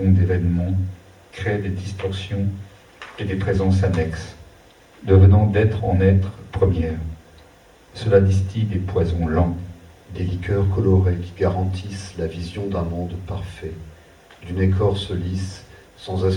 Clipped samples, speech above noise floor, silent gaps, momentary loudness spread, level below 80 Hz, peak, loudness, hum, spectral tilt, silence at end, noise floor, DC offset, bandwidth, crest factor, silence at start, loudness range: under 0.1%; 30 dB; none; 17 LU; -42 dBFS; -2 dBFS; -21 LUFS; none; -8 dB/octave; 0 s; -49 dBFS; under 0.1%; 9.8 kHz; 18 dB; 0 s; 7 LU